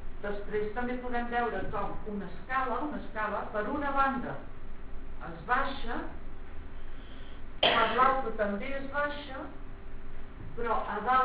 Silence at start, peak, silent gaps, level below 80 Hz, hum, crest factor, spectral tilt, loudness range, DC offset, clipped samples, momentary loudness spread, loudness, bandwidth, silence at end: 0 s; -10 dBFS; none; -44 dBFS; none; 22 dB; -2 dB/octave; 4 LU; under 0.1%; under 0.1%; 22 LU; -32 LUFS; 4 kHz; 0 s